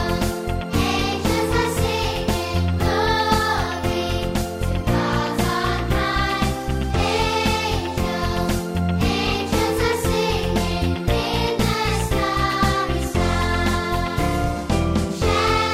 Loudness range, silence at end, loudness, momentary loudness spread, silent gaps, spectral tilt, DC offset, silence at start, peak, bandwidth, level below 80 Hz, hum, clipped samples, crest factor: 1 LU; 0 s; -21 LUFS; 4 LU; none; -5 dB/octave; under 0.1%; 0 s; -4 dBFS; 16 kHz; -28 dBFS; none; under 0.1%; 16 dB